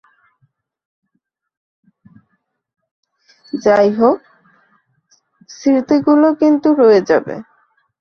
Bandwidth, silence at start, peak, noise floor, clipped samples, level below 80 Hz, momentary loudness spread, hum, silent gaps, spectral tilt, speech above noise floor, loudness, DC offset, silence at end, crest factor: 6.6 kHz; 3.55 s; 0 dBFS; -71 dBFS; under 0.1%; -62 dBFS; 13 LU; none; none; -6.5 dB/octave; 59 dB; -13 LUFS; under 0.1%; 0.6 s; 16 dB